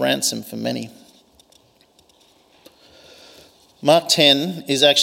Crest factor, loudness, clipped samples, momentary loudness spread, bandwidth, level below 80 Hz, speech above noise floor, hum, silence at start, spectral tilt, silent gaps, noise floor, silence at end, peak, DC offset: 20 dB; -17 LUFS; under 0.1%; 14 LU; 16.5 kHz; -68 dBFS; 38 dB; none; 0 s; -2.5 dB/octave; none; -56 dBFS; 0 s; 0 dBFS; under 0.1%